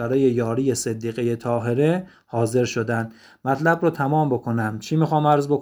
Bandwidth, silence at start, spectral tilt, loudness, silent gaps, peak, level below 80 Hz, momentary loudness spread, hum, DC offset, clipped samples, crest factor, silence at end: over 20 kHz; 0 s; -6.5 dB/octave; -22 LUFS; none; -4 dBFS; -60 dBFS; 7 LU; none; under 0.1%; under 0.1%; 18 dB; 0 s